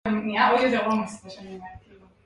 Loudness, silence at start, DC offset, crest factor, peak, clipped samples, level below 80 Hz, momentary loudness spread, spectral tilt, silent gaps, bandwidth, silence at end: -22 LUFS; 0.05 s; under 0.1%; 18 dB; -8 dBFS; under 0.1%; -56 dBFS; 21 LU; -5.5 dB/octave; none; 11 kHz; 0.45 s